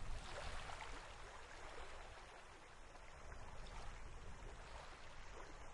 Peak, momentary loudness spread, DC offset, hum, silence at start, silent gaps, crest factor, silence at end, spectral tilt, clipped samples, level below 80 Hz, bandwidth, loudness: -34 dBFS; 8 LU; under 0.1%; none; 0 s; none; 16 dB; 0 s; -3.5 dB/octave; under 0.1%; -56 dBFS; 11.5 kHz; -56 LUFS